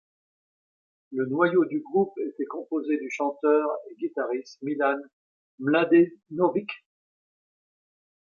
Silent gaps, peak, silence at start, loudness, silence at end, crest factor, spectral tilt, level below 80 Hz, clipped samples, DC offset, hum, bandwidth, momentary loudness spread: 5.13-5.58 s; -8 dBFS; 1.1 s; -26 LUFS; 1.6 s; 20 dB; -7 dB/octave; -78 dBFS; under 0.1%; under 0.1%; none; 7.2 kHz; 12 LU